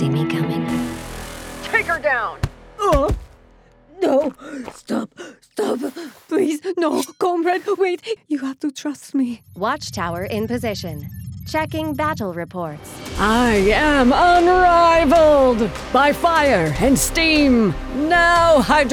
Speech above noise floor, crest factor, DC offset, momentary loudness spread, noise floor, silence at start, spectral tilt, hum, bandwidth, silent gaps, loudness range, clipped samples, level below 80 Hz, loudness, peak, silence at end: 32 dB; 16 dB; under 0.1%; 16 LU; -50 dBFS; 0 s; -5 dB/octave; none; over 20 kHz; none; 10 LU; under 0.1%; -34 dBFS; -18 LUFS; -4 dBFS; 0 s